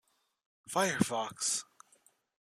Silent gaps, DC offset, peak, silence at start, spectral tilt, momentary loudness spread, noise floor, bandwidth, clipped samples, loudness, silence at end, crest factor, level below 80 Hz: none; under 0.1%; -12 dBFS; 0.65 s; -3 dB/octave; 6 LU; -69 dBFS; 14.5 kHz; under 0.1%; -33 LUFS; 0.9 s; 24 dB; -72 dBFS